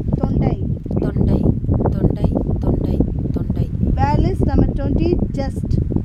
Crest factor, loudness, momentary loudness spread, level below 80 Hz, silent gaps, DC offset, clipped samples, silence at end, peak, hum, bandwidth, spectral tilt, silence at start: 16 dB; -19 LUFS; 5 LU; -24 dBFS; none; under 0.1%; under 0.1%; 0 s; 0 dBFS; none; 9.2 kHz; -10 dB/octave; 0 s